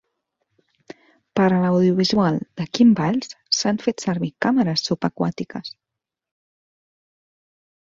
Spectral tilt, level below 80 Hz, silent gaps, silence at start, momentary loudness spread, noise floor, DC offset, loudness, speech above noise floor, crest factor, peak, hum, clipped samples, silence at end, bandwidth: -5.5 dB/octave; -60 dBFS; none; 1.35 s; 11 LU; -75 dBFS; under 0.1%; -20 LUFS; 56 dB; 18 dB; -4 dBFS; none; under 0.1%; 2.15 s; 7.8 kHz